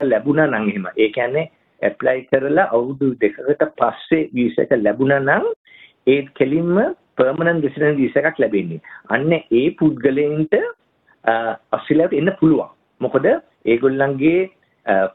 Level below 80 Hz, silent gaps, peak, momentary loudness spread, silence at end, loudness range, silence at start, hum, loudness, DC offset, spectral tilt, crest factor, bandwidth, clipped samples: -58 dBFS; 5.56-5.64 s; -2 dBFS; 7 LU; 0.05 s; 1 LU; 0 s; none; -18 LUFS; under 0.1%; -10 dB/octave; 16 dB; 4.1 kHz; under 0.1%